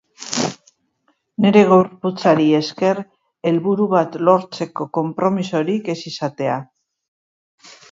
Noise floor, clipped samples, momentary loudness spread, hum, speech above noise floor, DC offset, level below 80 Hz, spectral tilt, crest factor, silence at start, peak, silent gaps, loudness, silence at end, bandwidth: -66 dBFS; under 0.1%; 12 LU; none; 49 dB; under 0.1%; -66 dBFS; -6 dB/octave; 18 dB; 0.2 s; 0 dBFS; none; -18 LUFS; 1.25 s; 7.8 kHz